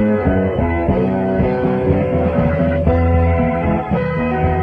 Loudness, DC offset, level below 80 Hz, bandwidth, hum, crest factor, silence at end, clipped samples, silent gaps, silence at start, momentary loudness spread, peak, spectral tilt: -16 LUFS; under 0.1%; -26 dBFS; 4.7 kHz; none; 14 dB; 0 s; under 0.1%; none; 0 s; 3 LU; -2 dBFS; -10.5 dB/octave